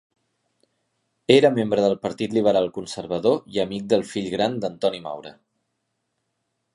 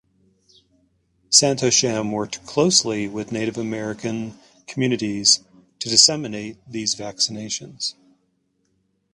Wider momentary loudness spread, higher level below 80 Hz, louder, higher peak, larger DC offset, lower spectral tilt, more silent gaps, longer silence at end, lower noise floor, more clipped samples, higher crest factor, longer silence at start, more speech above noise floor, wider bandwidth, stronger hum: about the same, 15 LU vs 15 LU; about the same, -62 dBFS vs -60 dBFS; second, -22 LUFS vs -19 LUFS; about the same, -2 dBFS vs 0 dBFS; neither; first, -5.5 dB/octave vs -2.5 dB/octave; neither; first, 1.45 s vs 1.2 s; first, -76 dBFS vs -68 dBFS; neither; about the same, 22 dB vs 24 dB; about the same, 1.3 s vs 1.3 s; first, 55 dB vs 47 dB; about the same, 11.5 kHz vs 11.5 kHz; neither